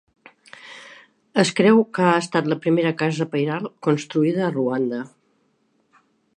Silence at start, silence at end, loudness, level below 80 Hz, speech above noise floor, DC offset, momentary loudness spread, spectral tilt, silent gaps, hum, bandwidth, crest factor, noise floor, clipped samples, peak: 0.65 s; 1.3 s; -21 LUFS; -72 dBFS; 46 dB; under 0.1%; 20 LU; -6 dB/octave; none; none; 11 kHz; 20 dB; -66 dBFS; under 0.1%; -2 dBFS